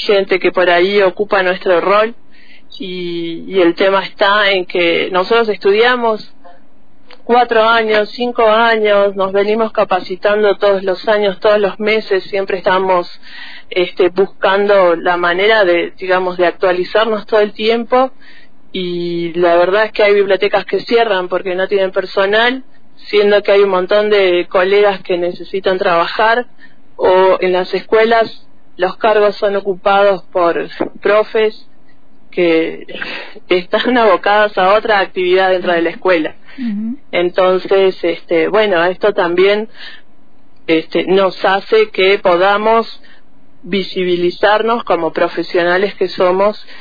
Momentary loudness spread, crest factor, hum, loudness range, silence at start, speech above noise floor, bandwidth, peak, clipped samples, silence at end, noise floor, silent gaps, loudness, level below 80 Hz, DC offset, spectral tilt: 9 LU; 12 dB; none; 2 LU; 0 s; 37 dB; 5 kHz; 0 dBFS; under 0.1%; 0.05 s; -50 dBFS; none; -13 LUFS; -50 dBFS; 3%; -6.5 dB/octave